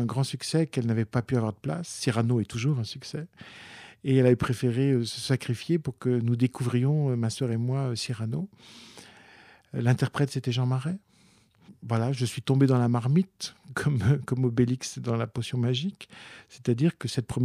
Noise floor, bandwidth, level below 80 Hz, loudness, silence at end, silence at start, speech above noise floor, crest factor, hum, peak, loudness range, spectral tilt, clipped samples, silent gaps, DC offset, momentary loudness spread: -61 dBFS; 13.5 kHz; -60 dBFS; -27 LUFS; 0 s; 0 s; 34 dB; 18 dB; none; -8 dBFS; 4 LU; -6.5 dB/octave; under 0.1%; none; under 0.1%; 14 LU